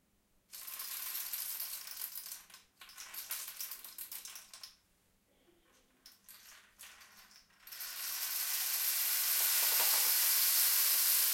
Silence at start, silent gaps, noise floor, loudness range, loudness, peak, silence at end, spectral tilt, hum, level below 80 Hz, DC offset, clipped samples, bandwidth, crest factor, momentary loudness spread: 0.55 s; none; -74 dBFS; 22 LU; -31 LUFS; -16 dBFS; 0 s; 4 dB/octave; none; -80 dBFS; under 0.1%; under 0.1%; 17 kHz; 20 dB; 22 LU